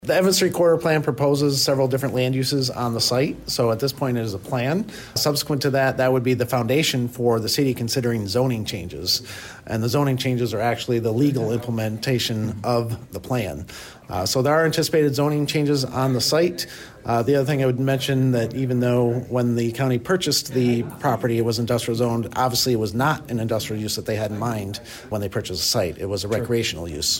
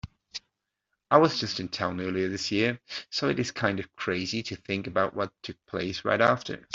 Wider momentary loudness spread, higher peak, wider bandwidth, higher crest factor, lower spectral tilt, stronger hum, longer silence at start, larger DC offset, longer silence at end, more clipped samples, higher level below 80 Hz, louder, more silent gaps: second, 7 LU vs 13 LU; second, -8 dBFS vs -4 dBFS; first, 16.5 kHz vs 7.8 kHz; second, 12 dB vs 24 dB; about the same, -5 dB/octave vs -5 dB/octave; neither; about the same, 0.05 s vs 0.05 s; neither; about the same, 0 s vs 0 s; neither; first, -50 dBFS vs -62 dBFS; first, -22 LUFS vs -28 LUFS; neither